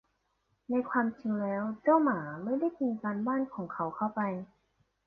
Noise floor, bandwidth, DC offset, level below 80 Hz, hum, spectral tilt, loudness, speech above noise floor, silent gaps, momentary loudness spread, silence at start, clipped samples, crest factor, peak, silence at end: -77 dBFS; 4.8 kHz; under 0.1%; -74 dBFS; none; -11 dB/octave; -32 LUFS; 46 dB; none; 9 LU; 0.7 s; under 0.1%; 18 dB; -14 dBFS; 0.6 s